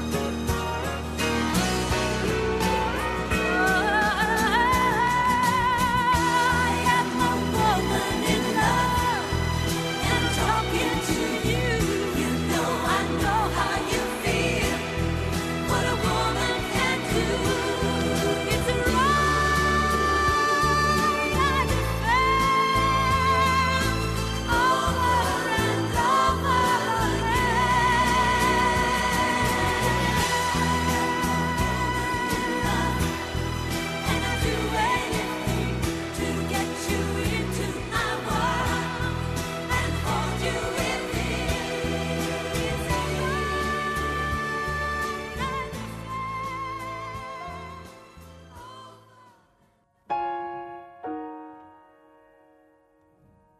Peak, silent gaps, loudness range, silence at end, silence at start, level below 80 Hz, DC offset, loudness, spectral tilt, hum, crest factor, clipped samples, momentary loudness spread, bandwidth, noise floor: -10 dBFS; none; 12 LU; 1.9 s; 0 s; -36 dBFS; under 0.1%; -24 LUFS; -4.5 dB/octave; none; 16 dB; under 0.1%; 8 LU; 13.5 kHz; -64 dBFS